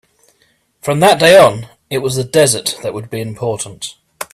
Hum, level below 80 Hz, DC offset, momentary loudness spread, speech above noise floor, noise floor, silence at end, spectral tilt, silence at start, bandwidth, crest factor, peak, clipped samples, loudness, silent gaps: none; -52 dBFS; under 0.1%; 20 LU; 45 dB; -58 dBFS; 0.1 s; -3.5 dB/octave; 0.85 s; 15 kHz; 14 dB; 0 dBFS; under 0.1%; -13 LUFS; none